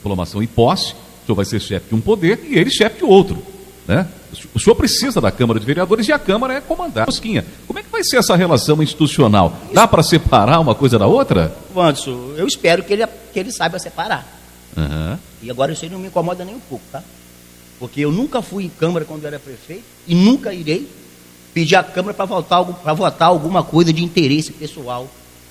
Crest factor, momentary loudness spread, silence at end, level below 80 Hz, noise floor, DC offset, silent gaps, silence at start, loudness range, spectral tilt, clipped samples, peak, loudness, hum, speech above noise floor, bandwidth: 16 dB; 16 LU; 0.4 s; -36 dBFS; -43 dBFS; under 0.1%; none; 0.05 s; 10 LU; -5.5 dB/octave; under 0.1%; 0 dBFS; -16 LUFS; none; 27 dB; 16 kHz